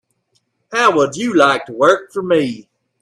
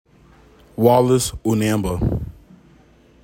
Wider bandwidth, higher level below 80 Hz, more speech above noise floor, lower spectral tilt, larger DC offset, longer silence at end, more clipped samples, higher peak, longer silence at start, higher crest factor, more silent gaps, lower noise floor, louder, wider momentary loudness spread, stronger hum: second, 13 kHz vs 16.5 kHz; second, -62 dBFS vs -36 dBFS; first, 51 dB vs 34 dB; second, -4.5 dB/octave vs -6 dB/octave; neither; second, 0.4 s vs 0.95 s; neither; about the same, 0 dBFS vs -2 dBFS; about the same, 0.7 s vs 0.8 s; about the same, 16 dB vs 18 dB; neither; first, -65 dBFS vs -51 dBFS; first, -15 LUFS vs -18 LUFS; second, 9 LU vs 15 LU; neither